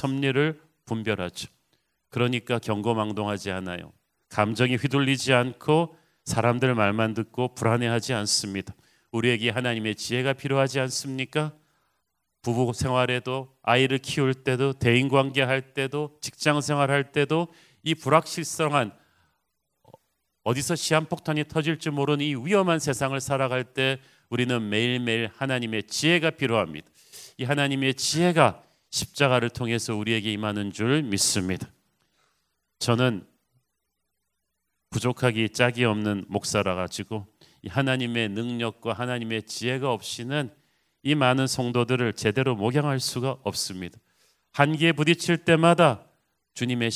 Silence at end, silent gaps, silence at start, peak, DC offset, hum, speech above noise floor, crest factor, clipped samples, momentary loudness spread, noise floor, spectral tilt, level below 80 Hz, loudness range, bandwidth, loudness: 0 s; none; 0 s; -2 dBFS; under 0.1%; none; 55 dB; 24 dB; under 0.1%; 11 LU; -80 dBFS; -4.5 dB/octave; -56 dBFS; 4 LU; 16 kHz; -25 LUFS